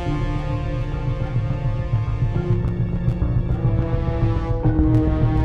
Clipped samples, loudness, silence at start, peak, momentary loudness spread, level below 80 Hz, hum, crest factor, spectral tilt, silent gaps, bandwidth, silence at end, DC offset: under 0.1%; -22 LUFS; 0 s; -6 dBFS; 7 LU; -26 dBFS; none; 14 dB; -9.5 dB/octave; none; 6 kHz; 0 s; under 0.1%